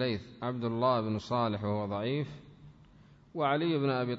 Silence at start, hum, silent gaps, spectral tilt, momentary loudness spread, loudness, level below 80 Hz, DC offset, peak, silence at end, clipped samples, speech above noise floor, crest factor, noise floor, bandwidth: 0 s; none; none; -8 dB/octave; 9 LU; -32 LUFS; -64 dBFS; under 0.1%; -16 dBFS; 0 s; under 0.1%; 27 dB; 16 dB; -58 dBFS; 7.8 kHz